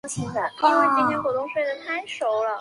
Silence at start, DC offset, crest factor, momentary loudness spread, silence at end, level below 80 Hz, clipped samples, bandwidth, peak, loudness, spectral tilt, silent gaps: 0.05 s; under 0.1%; 18 dB; 10 LU; 0 s; -62 dBFS; under 0.1%; 11.5 kHz; -6 dBFS; -23 LUFS; -4.5 dB/octave; none